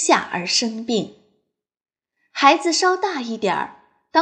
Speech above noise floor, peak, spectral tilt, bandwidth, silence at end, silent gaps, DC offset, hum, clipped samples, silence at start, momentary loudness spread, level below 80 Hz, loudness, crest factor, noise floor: 53 dB; -2 dBFS; -2.5 dB/octave; 10.5 kHz; 0 s; none; under 0.1%; none; under 0.1%; 0 s; 12 LU; -70 dBFS; -19 LUFS; 20 dB; -72 dBFS